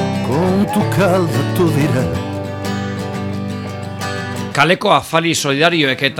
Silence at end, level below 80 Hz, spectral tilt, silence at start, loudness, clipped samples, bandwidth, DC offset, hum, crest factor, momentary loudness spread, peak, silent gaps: 0 s; -44 dBFS; -5 dB/octave; 0 s; -16 LUFS; under 0.1%; 18.5 kHz; under 0.1%; none; 16 dB; 10 LU; 0 dBFS; none